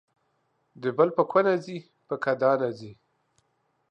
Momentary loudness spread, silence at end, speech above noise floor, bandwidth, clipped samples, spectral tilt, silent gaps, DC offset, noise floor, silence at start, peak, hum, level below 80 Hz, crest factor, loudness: 18 LU; 0.95 s; 48 dB; 8.4 kHz; under 0.1%; -7.5 dB/octave; none; under 0.1%; -73 dBFS; 0.8 s; -8 dBFS; none; -76 dBFS; 20 dB; -25 LUFS